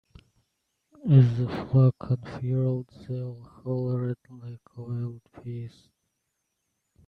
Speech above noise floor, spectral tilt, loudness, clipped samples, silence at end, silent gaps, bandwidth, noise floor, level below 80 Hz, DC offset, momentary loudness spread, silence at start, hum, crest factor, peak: 53 dB; -10.5 dB/octave; -26 LUFS; under 0.1%; 1.4 s; none; 4.9 kHz; -79 dBFS; -60 dBFS; under 0.1%; 22 LU; 1.05 s; none; 22 dB; -6 dBFS